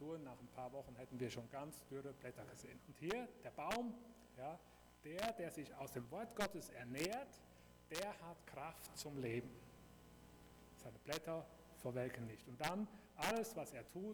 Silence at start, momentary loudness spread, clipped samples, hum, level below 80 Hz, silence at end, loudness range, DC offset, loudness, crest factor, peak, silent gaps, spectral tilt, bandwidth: 0 s; 18 LU; under 0.1%; 60 Hz at -70 dBFS; -72 dBFS; 0 s; 4 LU; under 0.1%; -49 LUFS; 22 dB; -28 dBFS; none; -4.5 dB/octave; over 20 kHz